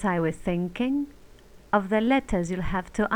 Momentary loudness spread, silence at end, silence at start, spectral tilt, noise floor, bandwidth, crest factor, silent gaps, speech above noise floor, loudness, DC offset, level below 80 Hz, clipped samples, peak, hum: 7 LU; 0 s; 0 s; -6.5 dB/octave; -50 dBFS; 16 kHz; 16 dB; none; 25 dB; -26 LUFS; 0.1%; -42 dBFS; under 0.1%; -10 dBFS; none